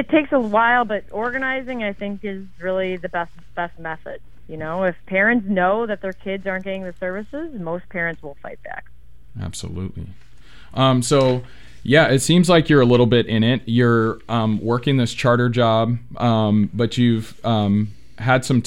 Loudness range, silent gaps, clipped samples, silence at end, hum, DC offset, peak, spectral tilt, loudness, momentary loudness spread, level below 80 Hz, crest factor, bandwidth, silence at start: 12 LU; none; under 0.1%; 0 s; none; 1%; -2 dBFS; -6 dB/octave; -19 LUFS; 17 LU; -46 dBFS; 18 dB; 14.5 kHz; 0 s